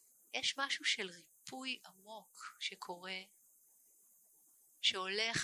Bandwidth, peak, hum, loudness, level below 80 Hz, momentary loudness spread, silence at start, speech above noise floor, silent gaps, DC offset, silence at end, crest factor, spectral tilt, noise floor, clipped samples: 16 kHz; -20 dBFS; none; -38 LUFS; -80 dBFS; 19 LU; 0.35 s; 27 dB; none; under 0.1%; 0 s; 24 dB; -1 dB/octave; -69 dBFS; under 0.1%